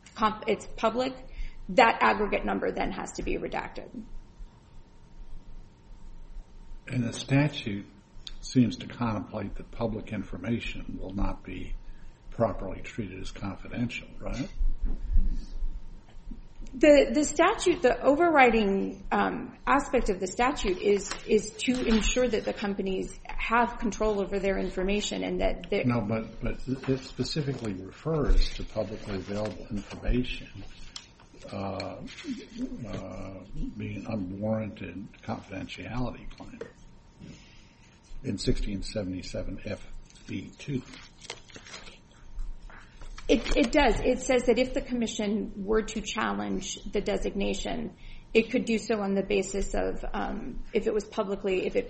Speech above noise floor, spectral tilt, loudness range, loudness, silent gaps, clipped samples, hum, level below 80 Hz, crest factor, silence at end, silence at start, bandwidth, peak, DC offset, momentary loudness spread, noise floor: 27 dB; -5 dB/octave; 13 LU; -29 LUFS; none; under 0.1%; none; -36 dBFS; 22 dB; 0 s; 0.05 s; 8.4 kHz; -6 dBFS; under 0.1%; 20 LU; -55 dBFS